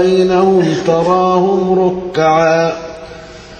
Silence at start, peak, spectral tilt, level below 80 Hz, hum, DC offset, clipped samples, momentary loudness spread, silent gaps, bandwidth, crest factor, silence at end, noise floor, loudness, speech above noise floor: 0 s; 0 dBFS; -6.5 dB/octave; -44 dBFS; none; under 0.1%; under 0.1%; 18 LU; none; 9 kHz; 12 dB; 0 s; -32 dBFS; -12 LUFS; 21 dB